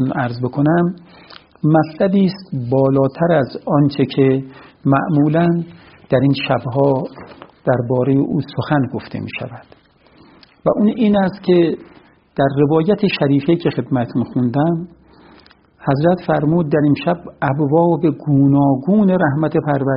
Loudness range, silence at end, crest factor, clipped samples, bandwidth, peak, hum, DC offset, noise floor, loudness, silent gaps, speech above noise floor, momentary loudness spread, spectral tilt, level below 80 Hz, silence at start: 4 LU; 0 s; 16 dB; under 0.1%; 5.6 kHz; 0 dBFS; none; under 0.1%; -49 dBFS; -16 LUFS; none; 34 dB; 9 LU; -7 dB/octave; -50 dBFS; 0 s